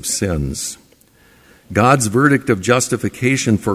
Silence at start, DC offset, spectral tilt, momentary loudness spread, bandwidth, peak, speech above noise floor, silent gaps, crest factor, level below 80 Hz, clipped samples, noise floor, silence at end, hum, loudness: 0 s; under 0.1%; -4.5 dB/octave; 10 LU; 16 kHz; 0 dBFS; 35 dB; none; 16 dB; -36 dBFS; under 0.1%; -51 dBFS; 0 s; none; -16 LUFS